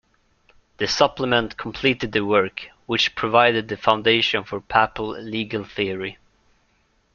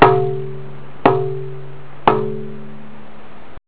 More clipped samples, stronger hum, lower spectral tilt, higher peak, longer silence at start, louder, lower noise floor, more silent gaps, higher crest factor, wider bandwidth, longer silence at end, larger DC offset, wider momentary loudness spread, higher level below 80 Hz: second, under 0.1% vs 0.1%; neither; second, -4 dB/octave vs -10.5 dB/octave; about the same, 0 dBFS vs 0 dBFS; first, 0.8 s vs 0 s; about the same, -21 LUFS vs -19 LUFS; first, -64 dBFS vs -41 dBFS; neither; about the same, 22 dB vs 20 dB; first, 7.2 kHz vs 4 kHz; first, 1.05 s vs 0 s; second, under 0.1% vs 5%; second, 11 LU vs 24 LU; second, -52 dBFS vs -46 dBFS